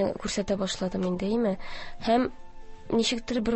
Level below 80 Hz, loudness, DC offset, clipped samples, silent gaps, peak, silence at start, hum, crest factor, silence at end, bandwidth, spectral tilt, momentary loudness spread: -48 dBFS; -28 LUFS; under 0.1%; under 0.1%; none; -10 dBFS; 0 s; none; 18 dB; 0 s; 8.6 kHz; -5 dB/octave; 7 LU